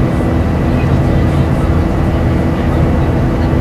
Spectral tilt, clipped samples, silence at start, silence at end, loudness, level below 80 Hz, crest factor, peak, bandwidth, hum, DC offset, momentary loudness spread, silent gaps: -8.5 dB/octave; under 0.1%; 0 s; 0 s; -13 LUFS; -20 dBFS; 12 dB; 0 dBFS; 12.5 kHz; none; under 0.1%; 1 LU; none